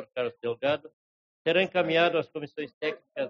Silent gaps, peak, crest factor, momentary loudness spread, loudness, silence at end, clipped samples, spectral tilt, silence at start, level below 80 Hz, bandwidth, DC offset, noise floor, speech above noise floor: 0.93-1.45 s, 2.74-2.81 s; -12 dBFS; 18 dB; 11 LU; -28 LUFS; 0 s; under 0.1%; -2.5 dB/octave; 0 s; -74 dBFS; 7 kHz; under 0.1%; under -90 dBFS; over 63 dB